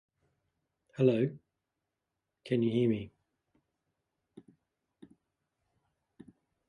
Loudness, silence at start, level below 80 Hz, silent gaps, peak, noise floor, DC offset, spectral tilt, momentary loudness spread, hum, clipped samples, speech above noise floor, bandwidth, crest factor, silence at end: -31 LUFS; 1 s; -72 dBFS; none; -14 dBFS; -87 dBFS; under 0.1%; -9 dB/octave; 22 LU; none; under 0.1%; 58 dB; 10 kHz; 22 dB; 3.6 s